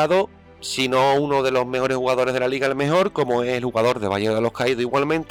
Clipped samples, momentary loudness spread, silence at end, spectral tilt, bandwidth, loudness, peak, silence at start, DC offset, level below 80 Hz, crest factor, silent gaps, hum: under 0.1%; 4 LU; 0.05 s; -5 dB/octave; 17.5 kHz; -21 LUFS; -10 dBFS; 0 s; under 0.1%; -54 dBFS; 12 dB; none; none